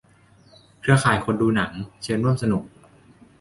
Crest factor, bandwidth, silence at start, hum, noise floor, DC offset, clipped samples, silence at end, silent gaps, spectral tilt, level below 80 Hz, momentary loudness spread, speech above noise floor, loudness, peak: 20 dB; 11.5 kHz; 0.85 s; none; -55 dBFS; under 0.1%; under 0.1%; 0.75 s; none; -6 dB/octave; -50 dBFS; 10 LU; 33 dB; -22 LUFS; -4 dBFS